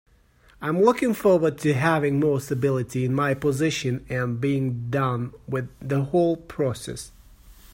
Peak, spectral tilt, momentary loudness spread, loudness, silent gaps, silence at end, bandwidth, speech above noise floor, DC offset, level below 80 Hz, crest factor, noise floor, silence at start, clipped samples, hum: -6 dBFS; -6.5 dB/octave; 11 LU; -24 LUFS; none; 0.2 s; 16.5 kHz; 33 dB; under 0.1%; -52 dBFS; 18 dB; -57 dBFS; 0.6 s; under 0.1%; none